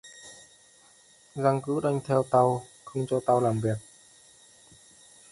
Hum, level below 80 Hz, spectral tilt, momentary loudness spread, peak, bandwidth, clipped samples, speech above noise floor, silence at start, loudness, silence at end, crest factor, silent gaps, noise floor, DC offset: none; -64 dBFS; -7 dB/octave; 19 LU; -8 dBFS; 11.5 kHz; under 0.1%; 32 dB; 0.05 s; -27 LUFS; 1.5 s; 20 dB; none; -58 dBFS; under 0.1%